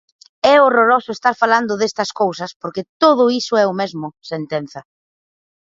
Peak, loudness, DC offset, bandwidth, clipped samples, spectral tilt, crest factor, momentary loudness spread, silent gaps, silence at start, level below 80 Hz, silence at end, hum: 0 dBFS; -16 LUFS; under 0.1%; 7.8 kHz; under 0.1%; -4.5 dB/octave; 18 dB; 15 LU; 2.56-2.60 s, 2.89-3.00 s; 0.45 s; -64 dBFS; 0.95 s; none